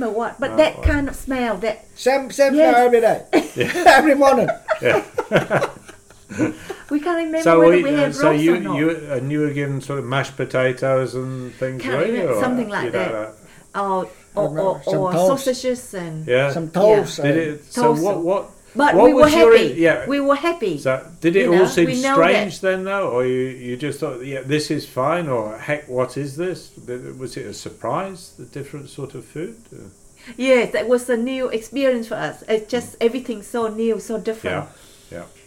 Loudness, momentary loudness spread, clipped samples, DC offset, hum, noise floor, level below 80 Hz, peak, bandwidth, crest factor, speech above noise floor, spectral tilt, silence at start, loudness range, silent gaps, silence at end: -18 LUFS; 16 LU; under 0.1%; under 0.1%; none; -44 dBFS; -42 dBFS; 0 dBFS; 16.5 kHz; 18 dB; 26 dB; -5.5 dB/octave; 0 s; 9 LU; none; 0.2 s